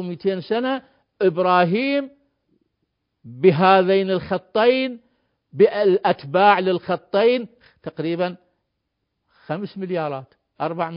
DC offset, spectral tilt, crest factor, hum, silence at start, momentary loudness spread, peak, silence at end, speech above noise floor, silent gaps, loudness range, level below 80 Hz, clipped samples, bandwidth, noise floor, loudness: under 0.1%; -11 dB/octave; 20 dB; none; 0 s; 14 LU; -2 dBFS; 0 s; 57 dB; none; 7 LU; -64 dBFS; under 0.1%; 5.4 kHz; -76 dBFS; -20 LUFS